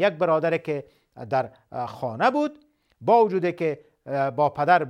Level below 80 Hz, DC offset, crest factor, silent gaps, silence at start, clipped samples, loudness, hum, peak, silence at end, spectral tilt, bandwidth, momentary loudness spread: -70 dBFS; under 0.1%; 18 dB; none; 0 s; under 0.1%; -24 LUFS; none; -4 dBFS; 0 s; -7.5 dB/octave; 10 kHz; 14 LU